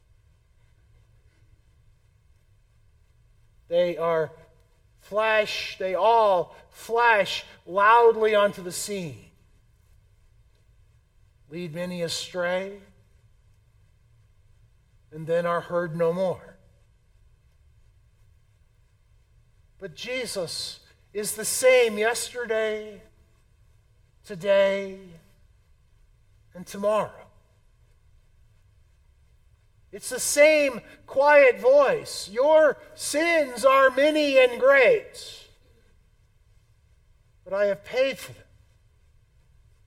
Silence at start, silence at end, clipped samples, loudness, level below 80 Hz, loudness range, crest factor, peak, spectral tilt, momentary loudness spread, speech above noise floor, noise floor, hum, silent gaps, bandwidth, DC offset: 3.7 s; 1.55 s; under 0.1%; -23 LUFS; -60 dBFS; 14 LU; 20 dB; -6 dBFS; -3 dB/octave; 20 LU; 37 dB; -60 dBFS; none; none; 16.5 kHz; under 0.1%